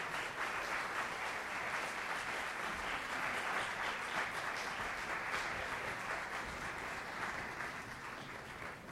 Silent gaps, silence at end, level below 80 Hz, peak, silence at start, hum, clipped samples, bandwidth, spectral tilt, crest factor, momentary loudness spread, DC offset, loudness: none; 0 s; -64 dBFS; -24 dBFS; 0 s; none; under 0.1%; 16 kHz; -2.5 dB/octave; 16 dB; 7 LU; under 0.1%; -40 LUFS